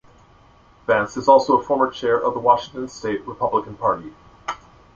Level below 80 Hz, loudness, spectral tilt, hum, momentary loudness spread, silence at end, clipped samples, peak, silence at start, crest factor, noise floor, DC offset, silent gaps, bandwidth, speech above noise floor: -54 dBFS; -20 LUFS; -5 dB/octave; none; 17 LU; 0.4 s; under 0.1%; -2 dBFS; 0.9 s; 20 dB; -51 dBFS; under 0.1%; none; 7.6 kHz; 32 dB